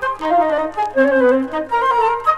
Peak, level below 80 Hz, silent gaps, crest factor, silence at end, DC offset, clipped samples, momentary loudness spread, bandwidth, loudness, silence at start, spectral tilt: -4 dBFS; -50 dBFS; none; 12 dB; 0 s; under 0.1%; under 0.1%; 6 LU; 11 kHz; -16 LUFS; 0 s; -5 dB/octave